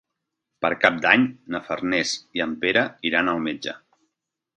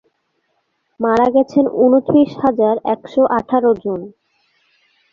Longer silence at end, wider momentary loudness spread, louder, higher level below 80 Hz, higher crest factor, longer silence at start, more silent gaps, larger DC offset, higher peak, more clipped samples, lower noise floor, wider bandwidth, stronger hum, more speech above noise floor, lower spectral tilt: second, 0.8 s vs 1.05 s; first, 13 LU vs 9 LU; second, -22 LUFS vs -15 LUFS; second, -60 dBFS vs -54 dBFS; first, 24 dB vs 14 dB; second, 0.6 s vs 1 s; neither; neither; about the same, 0 dBFS vs -2 dBFS; neither; first, -82 dBFS vs -67 dBFS; first, 9.8 kHz vs 7 kHz; neither; first, 59 dB vs 53 dB; second, -3.5 dB/octave vs -8 dB/octave